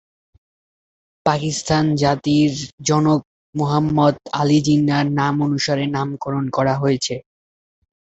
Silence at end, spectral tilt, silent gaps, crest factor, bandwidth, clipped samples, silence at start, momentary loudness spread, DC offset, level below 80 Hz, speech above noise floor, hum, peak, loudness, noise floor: 0.8 s; -5.5 dB/octave; 2.73-2.78 s, 3.25-3.53 s; 18 dB; 8.2 kHz; under 0.1%; 1.25 s; 7 LU; under 0.1%; -50 dBFS; over 72 dB; none; 0 dBFS; -19 LUFS; under -90 dBFS